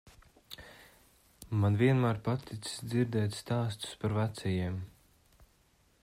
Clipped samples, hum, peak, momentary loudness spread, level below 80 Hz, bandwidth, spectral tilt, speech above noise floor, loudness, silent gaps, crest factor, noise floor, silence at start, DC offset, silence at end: under 0.1%; none; -14 dBFS; 22 LU; -64 dBFS; 15.5 kHz; -6.5 dB/octave; 37 dB; -32 LUFS; none; 18 dB; -68 dBFS; 0.05 s; under 0.1%; 1.15 s